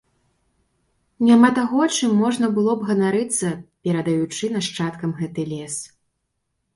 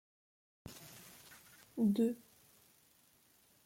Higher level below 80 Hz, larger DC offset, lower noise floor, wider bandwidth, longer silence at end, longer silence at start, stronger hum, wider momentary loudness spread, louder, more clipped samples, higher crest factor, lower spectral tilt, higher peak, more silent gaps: first, -62 dBFS vs -76 dBFS; neither; first, -75 dBFS vs -70 dBFS; second, 11.5 kHz vs 16.5 kHz; second, 0.9 s vs 1.5 s; first, 1.2 s vs 0.65 s; neither; second, 13 LU vs 24 LU; first, -20 LUFS vs -36 LUFS; neither; about the same, 20 dB vs 20 dB; second, -5 dB/octave vs -7 dB/octave; first, -2 dBFS vs -22 dBFS; neither